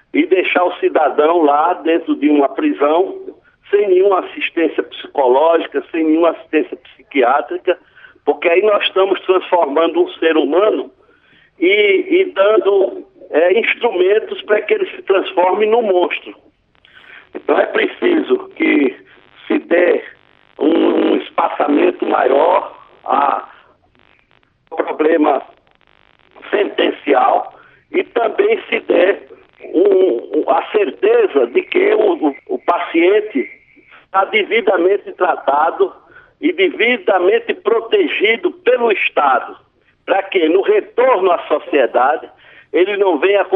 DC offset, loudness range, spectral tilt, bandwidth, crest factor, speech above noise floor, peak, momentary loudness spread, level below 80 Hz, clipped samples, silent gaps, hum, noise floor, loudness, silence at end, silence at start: under 0.1%; 3 LU; -7.5 dB/octave; 4.1 kHz; 14 dB; 42 dB; -2 dBFS; 8 LU; -66 dBFS; under 0.1%; none; none; -56 dBFS; -15 LUFS; 0 s; 0.15 s